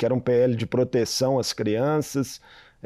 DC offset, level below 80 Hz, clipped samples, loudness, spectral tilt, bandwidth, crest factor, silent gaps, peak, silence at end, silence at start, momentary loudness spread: under 0.1%; -58 dBFS; under 0.1%; -24 LUFS; -5.5 dB/octave; 15 kHz; 12 dB; none; -12 dBFS; 0.5 s; 0 s; 8 LU